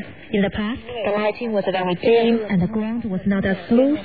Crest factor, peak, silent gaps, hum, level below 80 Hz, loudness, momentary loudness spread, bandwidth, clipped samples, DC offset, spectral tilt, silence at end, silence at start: 14 dB; -6 dBFS; none; none; -46 dBFS; -21 LUFS; 8 LU; 4.9 kHz; under 0.1%; 0.5%; -10.5 dB/octave; 0 s; 0 s